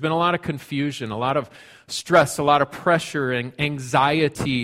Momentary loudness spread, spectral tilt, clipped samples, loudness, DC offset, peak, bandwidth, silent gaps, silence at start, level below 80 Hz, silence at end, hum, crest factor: 9 LU; -5 dB/octave; under 0.1%; -21 LUFS; under 0.1%; -4 dBFS; 16 kHz; none; 0 s; -54 dBFS; 0 s; none; 18 dB